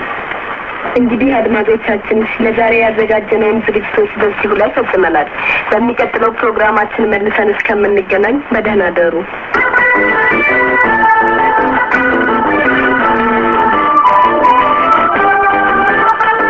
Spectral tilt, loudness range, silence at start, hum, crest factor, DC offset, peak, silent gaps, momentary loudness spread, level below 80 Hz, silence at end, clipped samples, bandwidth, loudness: -6.5 dB/octave; 3 LU; 0 s; none; 12 dB; 0.3%; 0 dBFS; none; 5 LU; -40 dBFS; 0 s; under 0.1%; 7.2 kHz; -11 LUFS